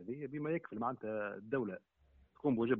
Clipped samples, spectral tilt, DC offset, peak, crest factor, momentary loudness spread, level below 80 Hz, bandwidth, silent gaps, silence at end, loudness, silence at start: under 0.1%; -7 dB/octave; under 0.1%; -20 dBFS; 18 dB; 7 LU; -72 dBFS; 3.9 kHz; none; 0 s; -40 LUFS; 0 s